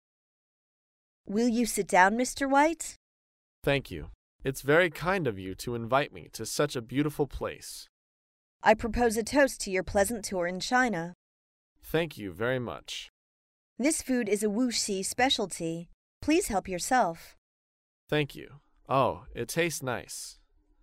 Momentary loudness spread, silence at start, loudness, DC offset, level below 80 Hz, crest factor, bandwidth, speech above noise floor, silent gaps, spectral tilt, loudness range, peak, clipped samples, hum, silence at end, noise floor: 14 LU; 1.25 s; -29 LUFS; under 0.1%; -52 dBFS; 22 dB; 16 kHz; over 61 dB; 2.96-3.62 s, 4.15-4.39 s, 7.89-8.60 s, 11.15-11.76 s, 13.10-13.76 s, 15.94-16.21 s, 17.38-18.07 s; -4 dB/octave; 5 LU; -8 dBFS; under 0.1%; none; 0.5 s; under -90 dBFS